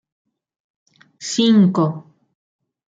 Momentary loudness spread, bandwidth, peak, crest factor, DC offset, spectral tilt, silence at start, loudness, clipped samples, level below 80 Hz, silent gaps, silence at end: 18 LU; 9 kHz; -4 dBFS; 16 dB; under 0.1%; -6 dB/octave; 1.2 s; -16 LUFS; under 0.1%; -66 dBFS; none; 0.85 s